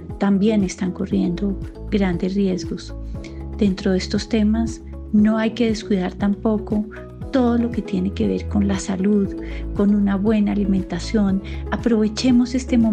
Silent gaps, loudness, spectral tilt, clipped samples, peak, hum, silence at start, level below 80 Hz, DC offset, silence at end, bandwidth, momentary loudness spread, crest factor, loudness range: none; -20 LUFS; -7 dB/octave; under 0.1%; -6 dBFS; none; 0 s; -34 dBFS; under 0.1%; 0 s; 9.2 kHz; 10 LU; 14 dB; 3 LU